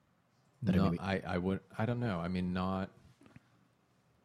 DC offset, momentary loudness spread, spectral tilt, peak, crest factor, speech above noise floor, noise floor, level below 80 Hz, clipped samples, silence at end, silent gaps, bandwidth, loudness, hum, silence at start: under 0.1%; 7 LU; -8 dB/octave; -18 dBFS; 20 dB; 38 dB; -72 dBFS; -60 dBFS; under 0.1%; 1.35 s; none; 9.8 kHz; -35 LUFS; none; 0.6 s